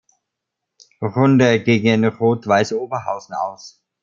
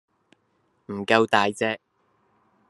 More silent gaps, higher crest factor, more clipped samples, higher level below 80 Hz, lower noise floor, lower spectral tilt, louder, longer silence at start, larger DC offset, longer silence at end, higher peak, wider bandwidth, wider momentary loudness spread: neither; second, 18 dB vs 24 dB; neither; first, -60 dBFS vs -72 dBFS; first, -80 dBFS vs -69 dBFS; first, -6.5 dB/octave vs -4.5 dB/octave; first, -18 LUFS vs -23 LUFS; about the same, 1 s vs 0.9 s; neither; second, 0.35 s vs 0.95 s; about the same, -2 dBFS vs -2 dBFS; second, 7.6 kHz vs 12.5 kHz; second, 12 LU vs 16 LU